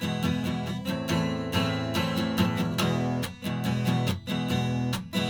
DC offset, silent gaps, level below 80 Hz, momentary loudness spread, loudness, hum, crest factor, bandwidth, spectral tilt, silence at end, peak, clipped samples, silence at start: under 0.1%; none; -52 dBFS; 5 LU; -28 LUFS; none; 18 dB; over 20 kHz; -5.5 dB/octave; 0 s; -10 dBFS; under 0.1%; 0 s